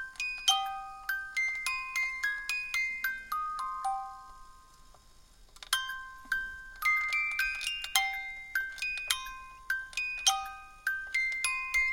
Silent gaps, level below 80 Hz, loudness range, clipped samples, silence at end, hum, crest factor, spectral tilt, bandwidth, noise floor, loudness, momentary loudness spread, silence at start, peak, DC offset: none; -58 dBFS; 6 LU; under 0.1%; 0 s; none; 26 dB; 3 dB/octave; 17 kHz; -57 dBFS; -31 LUFS; 11 LU; 0 s; -8 dBFS; under 0.1%